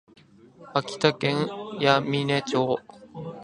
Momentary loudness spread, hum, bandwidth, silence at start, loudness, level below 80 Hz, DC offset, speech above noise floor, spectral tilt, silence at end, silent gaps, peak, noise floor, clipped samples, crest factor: 12 LU; none; 11 kHz; 0.6 s; -25 LUFS; -66 dBFS; under 0.1%; 27 dB; -5.5 dB/octave; 0 s; none; -2 dBFS; -51 dBFS; under 0.1%; 24 dB